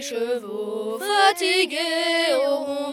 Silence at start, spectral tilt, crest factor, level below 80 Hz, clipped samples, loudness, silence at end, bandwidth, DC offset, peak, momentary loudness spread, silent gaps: 0 s; -1.5 dB/octave; 18 dB; -78 dBFS; under 0.1%; -21 LUFS; 0 s; 18.5 kHz; under 0.1%; -4 dBFS; 10 LU; none